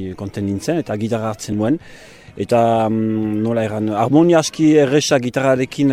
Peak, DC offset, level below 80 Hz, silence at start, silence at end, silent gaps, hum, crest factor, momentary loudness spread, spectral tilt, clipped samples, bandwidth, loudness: -2 dBFS; under 0.1%; -52 dBFS; 0 s; 0 s; none; none; 14 dB; 10 LU; -6 dB/octave; under 0.1%; 15 kHz; -17 LUFS